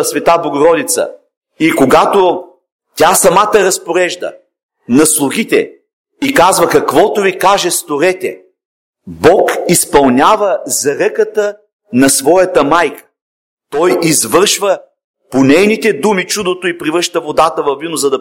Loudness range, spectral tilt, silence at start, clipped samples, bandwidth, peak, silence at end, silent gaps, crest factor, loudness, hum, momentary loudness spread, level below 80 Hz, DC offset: 2 LU; -3 dB/octave; 0 s; 0.2%; 17.5 kHz; 0 dBFS; 0 s; 1.37-1.41 s, 2.72-2.79 s, 4.63-4.69 s, 5.93-6.04 s, 8.65-8.93 s, 11.73-11.79 s, 13.21-13.57 s, 15.04-15.14 s; 12 dB; -11 LUFS; none; 9 LU; -44 dBFS; under 0.1%